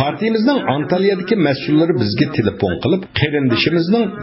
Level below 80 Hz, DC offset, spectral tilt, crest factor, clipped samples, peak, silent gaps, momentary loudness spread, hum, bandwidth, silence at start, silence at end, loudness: -44 dBFS; under 0.1%; -10.5 dB/octave; 16 dB; under 0.1%; 0 dBFS; none; 3 LU; none; 5.8 kHz; 0 s; 0 s; -16 LUFS